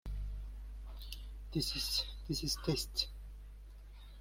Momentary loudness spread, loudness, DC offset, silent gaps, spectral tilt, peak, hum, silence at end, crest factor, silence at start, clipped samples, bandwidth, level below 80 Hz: 20 LU; -38 LUFS; under 0.1%; none; -3.5 dB/octave; -18 dBFS; 50 Hz at -45 dBFS; 0 s; 22 dB; 0.05 s; under 0.1%; 16.5 kHz; -46 dBFS